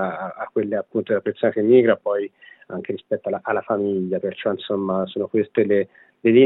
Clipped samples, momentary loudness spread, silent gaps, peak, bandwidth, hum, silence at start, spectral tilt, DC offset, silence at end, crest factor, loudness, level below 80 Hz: under 0.1%; 14 LU; none; -4 dBFS; 4.1 kHz; none; 0 s; -11 dB/octave; under 0.1%; 0 s; 18 dB; -22 LUFS; -78 dBFS